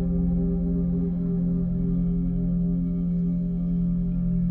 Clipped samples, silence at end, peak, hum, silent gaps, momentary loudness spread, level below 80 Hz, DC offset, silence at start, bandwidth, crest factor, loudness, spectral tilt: under 0.1%; 0 s; -14 dBFS; none; none; 1 LU; -32 dBFS; under 0.1%; 0 s; 1.4 kHz; 10 dB; -25 LUFS; -14 dB/octave